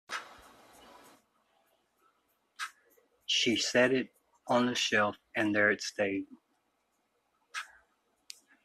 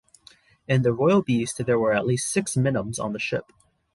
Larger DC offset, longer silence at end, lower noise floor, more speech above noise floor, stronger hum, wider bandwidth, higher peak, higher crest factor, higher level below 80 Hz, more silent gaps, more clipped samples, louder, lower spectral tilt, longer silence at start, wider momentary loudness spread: neither; first, 1 s vs 0.5 s; first, -77 dBFS vs -55 dBFS; first, 48 dB vs 32 dB; neither; first, 14 kHz vs 11.5 kHz; second, -12 dBFS vs -8 dBFS; first, 22 dB vs 16 dB; second, -76 dBFS vs -56 dBFS; neither; neither; second, -29 LUFS vs -23 LUFS; second, -3 dB/octave vs -5.5 dB/octave; second, 0.1 s vs 0.7 s; first, 23 LU vs 8 LU